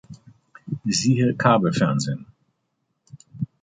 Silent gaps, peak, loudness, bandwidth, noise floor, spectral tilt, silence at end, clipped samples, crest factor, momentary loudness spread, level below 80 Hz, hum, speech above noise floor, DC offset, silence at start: none; -4 dBFS; -21 LUFS; 9.6 kHz; -74 dBFS; -5.5 dB/octave; 0.2 s; under 0.1%; 20 dB; 15 LU; -58 dBFS; none; 55 dB; under 0.1%; 0.1 s